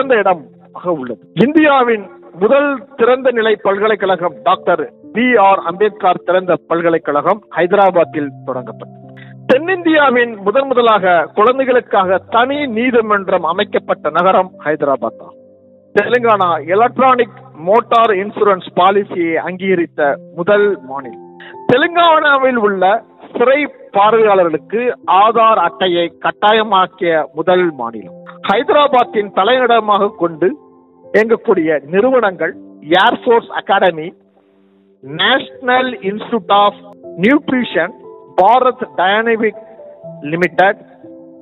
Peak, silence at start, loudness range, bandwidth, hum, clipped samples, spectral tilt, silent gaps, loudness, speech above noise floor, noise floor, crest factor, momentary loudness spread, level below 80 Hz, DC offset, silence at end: 0 dBFS; 0 s; 3 LU; 6.4 kHz; none; under 0.1%; -7 dB/octave; none; -13 LUFS; 38 dB; -51 dBFS; 14 dB; 11 LU; -62 dBFS; under 0.1%; 0.2 s